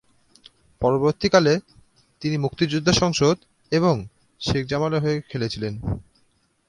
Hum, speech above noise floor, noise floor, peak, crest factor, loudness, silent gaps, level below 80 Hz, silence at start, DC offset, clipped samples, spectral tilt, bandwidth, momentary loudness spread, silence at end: none; 43 dB; -64 dBFS; -2 dBFS; 22 dB; -22 LUFS; none; -46 dBFS; 0.8 s; under 0.1%; under 0.1%; -5.5 dB/octave; 11.5 kHz; 12 LU; 0.7 s